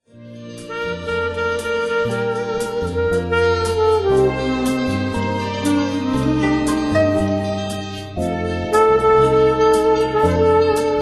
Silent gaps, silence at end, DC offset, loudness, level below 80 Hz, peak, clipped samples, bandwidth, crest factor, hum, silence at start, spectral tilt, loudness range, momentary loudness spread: none; 0 s; under 0.1%; -18 LUFS; -34 dBFS; -2 dBFS; under 0.1%; 12.5 kHz; 16 dB; none; 0.15 s; -6 dB/octave; 4 LU; 10 LU